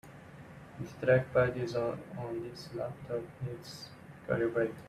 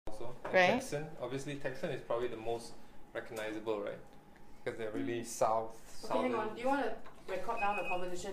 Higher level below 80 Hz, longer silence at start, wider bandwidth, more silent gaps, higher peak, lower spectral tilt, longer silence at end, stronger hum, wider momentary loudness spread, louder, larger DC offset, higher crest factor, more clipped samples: about the same, -62 dBFS vs -60 dBFS; about the same, 0.05 s vs 0.05 s; second, 14 kHz vs 15.5 kHz; neither; about the same, -14 dBFS vs -16 dBFS; first, -7 dB/octave vs -4.5 dB/octave; about the same, 0 s vs 0 s; neither; first, 21 LU vs 14 LU; first, -34 LUFS vs -37 LUFS; neither; about the same, 20 dB vs 20 dB; neither